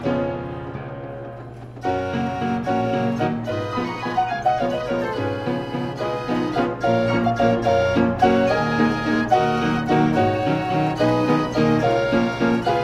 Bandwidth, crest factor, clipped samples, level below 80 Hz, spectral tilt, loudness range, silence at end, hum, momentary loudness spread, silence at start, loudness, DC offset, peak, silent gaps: 12 kHz; 16 dB; under 0.1%; -46 dBFS; -7 dB/octave; 6 LU; 0 s; none; 10 LU; 0 s; -21 LUFS; under 0.1%; -4 dBFS; none